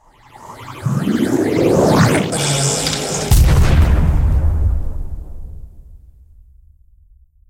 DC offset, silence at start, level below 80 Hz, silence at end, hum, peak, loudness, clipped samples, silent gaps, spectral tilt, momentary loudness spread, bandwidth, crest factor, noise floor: under 0.1%; 0.4 s; -20 dBFS; 1.55 s; none; -2 dBFS; -15 LUFS; under 0.1%; none; -5 dB/octave; 21 LU; 16.5 kHz; 14 dB; -48 dBFS